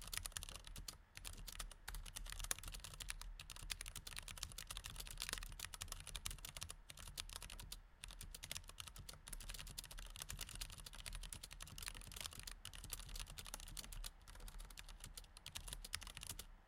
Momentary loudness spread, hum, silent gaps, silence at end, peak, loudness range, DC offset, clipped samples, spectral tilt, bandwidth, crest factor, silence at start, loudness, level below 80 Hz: 8 LU; none; none; 0 s; -20 dBFS; 3 LU; under 0.1%; under 0.1%; -1 dB/octave; 17 kHz; 32 dB; 0 s; -51 LUFS; -56 dBFS